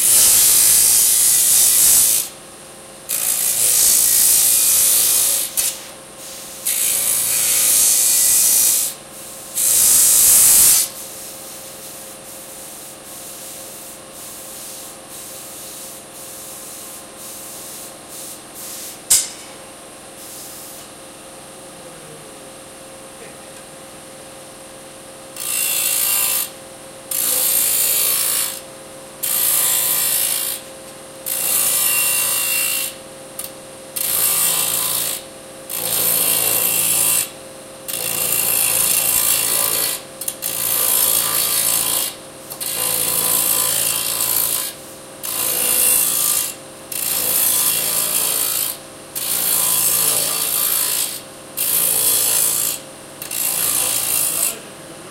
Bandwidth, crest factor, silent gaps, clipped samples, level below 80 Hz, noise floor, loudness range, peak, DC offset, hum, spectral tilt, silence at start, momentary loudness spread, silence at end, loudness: 16 kHz; 18 dB; none; under 0.1%; -54 dBFS; -38 dBFS; 19 LU; 0 dBFS; under 0.1%; none; 1 dB/octave; 0 s; 25 LU; 0 s; -14 LUFS